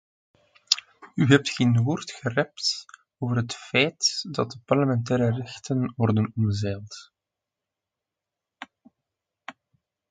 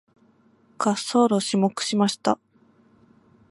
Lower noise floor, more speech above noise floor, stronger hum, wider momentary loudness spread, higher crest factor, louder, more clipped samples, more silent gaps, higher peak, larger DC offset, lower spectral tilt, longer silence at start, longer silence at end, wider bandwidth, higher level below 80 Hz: first, -87 dBFS vs -59 dBFS; first, 63 dB vs 37 dB; neither; first, 24 LU vs 6 LU; first, 26 dB vs 20 dB; about the same, -25 LUFS vs -23 LUFS; neither; neither; first, 0 dBFS vs -4 dBFS; neither; about the same, -5 dB/octave vs -4.5 dB/octave; about the same, 0.7 s vs 0.8 s; second, 0.6 s vs 1.15 s; second, 9.4 kHz vs 11.5 kHz; first, -58 dBFS vs -74 dBFS